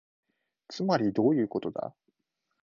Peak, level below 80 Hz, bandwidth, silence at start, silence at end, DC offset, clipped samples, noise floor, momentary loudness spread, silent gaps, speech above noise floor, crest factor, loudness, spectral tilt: -12 dBFS; -70 dBFS; 7.2 kHz; 0.7 s; 0.75 s; under 0.1%; under 0.1%; -81 dBFS; 15 LU; none; 54 dB; 18 dB; -29 LUFS; -7.5 dB/octave